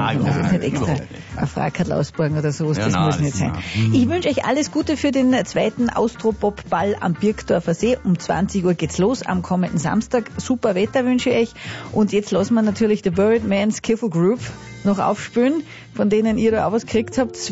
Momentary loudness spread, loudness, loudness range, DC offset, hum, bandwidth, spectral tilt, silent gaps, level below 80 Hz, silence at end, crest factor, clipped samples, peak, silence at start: 5 LU; -20 LUFS; 1 LU; under 0.1%; none; 8 kHz; -6 dB/octave; none; -44 dBFS; 0 s; 12 dB; under 0.1%; -8 dBFS; 0 s